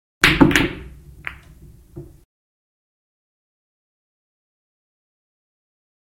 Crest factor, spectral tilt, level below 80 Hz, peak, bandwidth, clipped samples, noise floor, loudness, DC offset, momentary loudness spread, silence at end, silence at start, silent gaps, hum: 24 dB; -4.5 dB/octave; -40 dBFS; 0 dBFS; 16.5 kHz; under 0.1%; -45 dBFS; -15 LUFS; under 0.1%; 21 LU; 4 s; 0.2 s; none; none